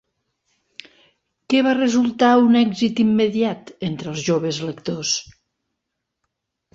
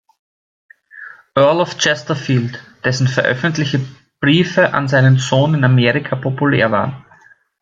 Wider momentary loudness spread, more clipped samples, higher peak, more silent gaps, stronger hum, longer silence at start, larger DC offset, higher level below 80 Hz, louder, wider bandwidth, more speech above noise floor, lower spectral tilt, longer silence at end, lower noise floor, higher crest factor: first, 12 LU vs 9 LU; neither; about the same, -4 dBFS vs -2 dBFS; neither; neither; first, 1.5 s vs 0.95 s; neither; second, -60 dBFS vs -54 dBFS; second, -19 LUFS vs -15 LUFS; about the same, 7.8 kHz vs 7.6 kHz; first, 61 dB vs 34 dB; about the same, -4.5 dB/octave vs -5.5 dB/octave; first, 1.55 s vs 0.6 s; first, -79 dBFS vs -48 dBFS; about the same, 16 dB vs 14 dB